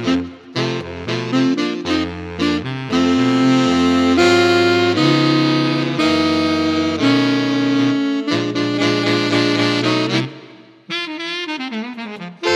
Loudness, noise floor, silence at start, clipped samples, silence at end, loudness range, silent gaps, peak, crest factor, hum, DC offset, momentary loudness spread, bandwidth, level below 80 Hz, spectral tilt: -17 LUFS; -42 dBFS; 0 s; under 0.1%; 0 s; 5 LU; none; -2 dBFS; 16 dB; none; under 0.1%; 10 LU; 11.5 kHz; -50 dBFS; -5.5 dB/octave